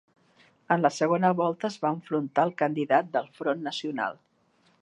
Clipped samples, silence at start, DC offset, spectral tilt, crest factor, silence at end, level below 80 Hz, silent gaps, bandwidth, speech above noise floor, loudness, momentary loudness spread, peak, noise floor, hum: under 0.1%; 0.7 s; under 0.1%; -6 dB/octave; 20 dB; 0.7 s; -80 dBFS; none; 10.5 kHz; 40 dB; -27 LUFS; 8 LU; -8 dBFS; -66 dBFS; none